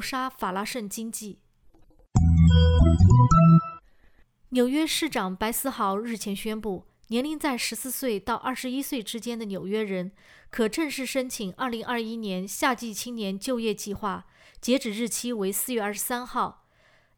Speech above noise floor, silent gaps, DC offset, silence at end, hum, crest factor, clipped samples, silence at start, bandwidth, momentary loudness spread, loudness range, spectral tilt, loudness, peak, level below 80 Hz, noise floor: 36 dB; none; under 0.1%; 0.65 s; none; 18 dB; under 0.1%; 0 s; over 20 kHz; 15 LU; 9 LU; -5.5 dB/octave; -25 LUFS; -8 dBFS; -38 dBFS; -61 dBFS